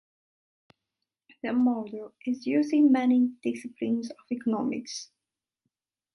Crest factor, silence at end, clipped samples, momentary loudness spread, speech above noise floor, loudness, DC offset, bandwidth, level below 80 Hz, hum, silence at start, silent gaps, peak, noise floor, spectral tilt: 16 dB; 1.1 s; under 0.1%; 16 LU; 60 dB; -27 LUFS; under 0.1%; 11 kHz; -76 dBFS; none; 1.45 s; none; -12 dBFS; -86 dBFS; -5.5 dB/octave